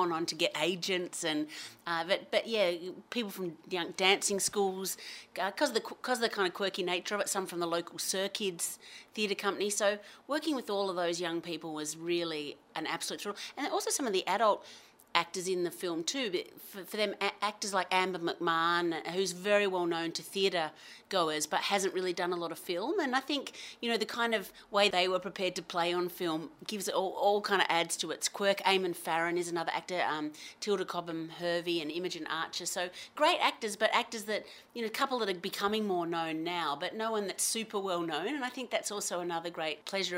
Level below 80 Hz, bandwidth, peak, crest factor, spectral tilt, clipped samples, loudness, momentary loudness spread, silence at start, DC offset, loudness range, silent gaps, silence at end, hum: -80 dBFS; 16 kHz; -8 dBFS; 26 dB; -2.5 dB/octave; under 0.1%; -33 LUFS; 9 LU; 0 s; under 0.1%; 3 LU; none; 0 s; none